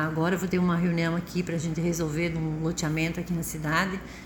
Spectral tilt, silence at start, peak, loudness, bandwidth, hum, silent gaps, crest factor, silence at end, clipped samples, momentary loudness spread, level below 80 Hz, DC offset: -5.5 dB/octave; 0 s; -10 dBFS; -28 LUFS; 17 kHz; none; none; 18 dB; 0 s; under 0.1%; 5 LU; -48 dBFS; under 0.1%